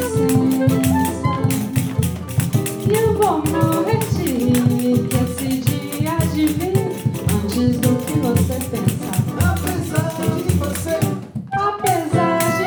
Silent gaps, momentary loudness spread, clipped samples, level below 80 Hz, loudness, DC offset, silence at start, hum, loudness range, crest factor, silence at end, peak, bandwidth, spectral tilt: none; 5 LU; under 0.1%; -40 dBFS; -19 LUFS; under 0.1%; 0 s; none; 2 LU; 16 dB; 0 s; -2 dBFS; over 20 kHz; -6 dB/octave